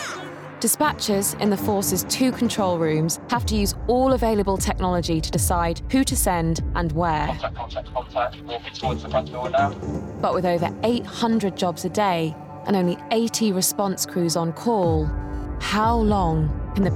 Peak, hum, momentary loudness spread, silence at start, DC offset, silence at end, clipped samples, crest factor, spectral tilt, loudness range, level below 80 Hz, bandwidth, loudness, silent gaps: -8 dBFS; none; 8 LU; 0 s; under 0.1%; 0 s; under 0.1%; 14 dB; -4.5 dB/octave; 4 LU; -34 dBFS; 17 kHz; -23 LUFS; none